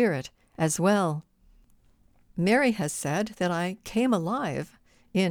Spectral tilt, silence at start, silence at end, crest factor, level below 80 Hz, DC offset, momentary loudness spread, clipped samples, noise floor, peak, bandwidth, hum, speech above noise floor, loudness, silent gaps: -5 dB/octave; 0 s; 0 s; 18 dB; -60 dBFS; under 0.1%; 13 LU; under 0.1%; -61 dBFS; -10 dBFS; 18.5 kHz; none; 35 dB; -27 LUFS; none